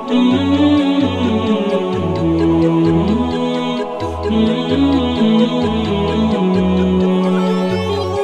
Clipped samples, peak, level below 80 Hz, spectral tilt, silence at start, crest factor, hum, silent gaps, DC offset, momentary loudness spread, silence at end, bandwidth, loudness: under 0.1%; -2 dBFS; -36 dBFS; -7.5 dB/octave; 0 s; 12 dB; none; none; 0.3%; 5 LU; 0 s; 9.8 kHz; -15 LUFS